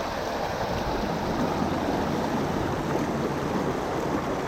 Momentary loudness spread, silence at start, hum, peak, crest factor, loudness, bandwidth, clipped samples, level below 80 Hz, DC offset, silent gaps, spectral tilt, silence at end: 2 LU; 0 s; none; -12 dBFS; 14 dB; -28 LUFS; 17.5 kHz; under 0.1%; -44 dBFS; under 0.1%; none; -6 dB/octave; 0 s